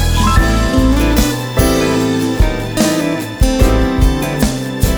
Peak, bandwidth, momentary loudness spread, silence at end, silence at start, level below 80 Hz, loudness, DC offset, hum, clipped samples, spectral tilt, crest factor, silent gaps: 0 dBFS; over 20 kHz; 4 LU; 0 s; 0 s; -16 dBFS; -14 LUFS; 0.3%; none; under 0.1%; -5.5 dB/octave; 12 dB; none